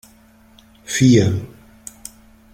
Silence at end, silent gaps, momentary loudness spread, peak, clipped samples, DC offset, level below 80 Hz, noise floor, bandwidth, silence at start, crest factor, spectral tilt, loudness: 1.05 s; none; 25 LU; -2 dBFS; under 0.1%; under 0.1%; -48 dBFS; -50 dBFS; 16 kHz; 0.9 s; 18 dB; -5.5 dB/octave; -16 LUFS